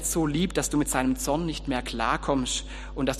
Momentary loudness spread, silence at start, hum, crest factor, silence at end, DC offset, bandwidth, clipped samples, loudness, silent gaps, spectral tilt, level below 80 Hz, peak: 5 LU; 0 s; none; 18 dB; 0 s; under 0.1%; 15 kHz; under 0.1%; -27 LUFS; none; -4 dB/octave; -38 dBFS; -8 dBFS